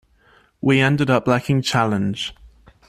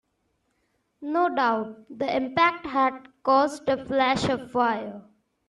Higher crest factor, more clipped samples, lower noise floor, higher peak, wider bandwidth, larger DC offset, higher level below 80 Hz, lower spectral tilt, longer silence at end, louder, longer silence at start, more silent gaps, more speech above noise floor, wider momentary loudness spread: about the same, 18 dB vs 18 dB; neither; second, -56 dBFS vs -73 dBFS; first, -2 dBFS vs -8 dBFS; first, 14 kHz vs 12 kHz; neither; first, -50 dBFS vs -60 dBFS; about the same, -6 dB/octave vs -5 dB/octave; about the same, 0.4 s vs 0.45 s; first, -19 LUFS vs -25 LUFS; second, 0.65 s vs 1 s; neither; second, 37 dB vs 49 dB; about the same, 8 LU vs 10 LU